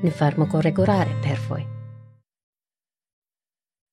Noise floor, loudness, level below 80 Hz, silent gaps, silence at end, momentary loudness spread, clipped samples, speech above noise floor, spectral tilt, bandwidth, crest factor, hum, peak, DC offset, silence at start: under -90 dBFS; -22 LUFS; -62 dBFS; none; 1.85 s; 16 LU; under 0.1%; over 69 dB; -8 dB/octave; 11 kHz; 18 dB; none; -6 dBFS; under 0.1%; 0 s